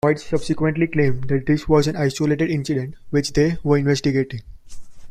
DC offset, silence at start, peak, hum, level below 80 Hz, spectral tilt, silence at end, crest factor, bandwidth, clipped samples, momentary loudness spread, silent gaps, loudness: under 0.1%; 0.05 s; -4 dBFS; none; -40 dBFS; -6.5 dB/octave; 0 s; 16 dB; 13.5 kHz; under 0.1%; 6 LU; none; -20 LUFS